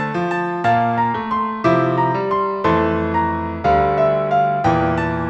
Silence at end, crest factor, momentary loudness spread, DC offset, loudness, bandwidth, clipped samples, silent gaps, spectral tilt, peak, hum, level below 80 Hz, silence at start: 0 s; 14 dB; 4 LU; under 0.1%; -18 LUFS; 7.8 kHz; under 0.1%; none; -8 dB/octave; -4 dBFS; none; -42 dBFS; 0 s